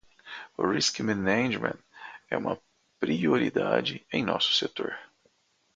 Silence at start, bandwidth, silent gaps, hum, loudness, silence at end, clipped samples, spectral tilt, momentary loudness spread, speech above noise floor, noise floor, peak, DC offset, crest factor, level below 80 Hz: 0.25 s; 9.6 kHz; none; none; -28 LUFS; 0.7 s; under 0.1%; -4 dB/octave; 17 LU; 41 dB; -68 dBFS; -8 dBFS; under 0.1%; 22 dB; -64 dBFS